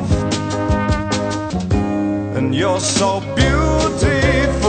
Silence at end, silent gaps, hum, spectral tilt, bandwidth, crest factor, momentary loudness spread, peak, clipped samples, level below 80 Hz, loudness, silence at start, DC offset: 0 s; none; none; -5 dB/octave; 9.2 kHz; 16 dB; 5 LU; -2 dBFS; under 0.1%; -26 dBFS; -17 LUFS; 0 s; under 0.1%